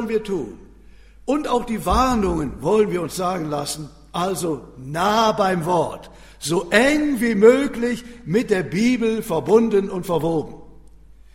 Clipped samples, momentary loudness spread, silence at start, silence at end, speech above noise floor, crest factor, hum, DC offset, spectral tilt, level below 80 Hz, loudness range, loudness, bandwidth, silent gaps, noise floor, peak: under 0.1%; 12 LU; 0 s; 0.65 s; 26 dB; 20 dB; none; under 0.1%; -5 dB/octave; -40 dBFS; 4 LU; -20 LUFS; 16 kHz; none; -45 dBFS; 0 dBFS